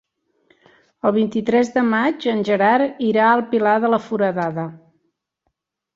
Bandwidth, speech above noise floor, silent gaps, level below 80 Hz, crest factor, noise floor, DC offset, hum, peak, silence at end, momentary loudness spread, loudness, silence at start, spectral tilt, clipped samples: 7.6 kHz; 56 dB; none; -64 dBFS; 16 dB; -74 dBFS; under 0.1%; none; -4 dBFS; 1.2 s; 7 LU; -18 LUFS; 1.05 s; -6.5 dB/octave; under 0.1%